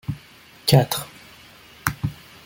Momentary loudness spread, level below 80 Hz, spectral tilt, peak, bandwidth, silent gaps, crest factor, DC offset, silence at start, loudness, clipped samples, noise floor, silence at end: 20 LU; -48 dBFS; -5 dB/octave; -2 dBFS; 17 kHz; none; 22 dB; under 0.1%; 0.1 s; -23 LUFS; under 0.1%; -48 dBFS; 0.3 s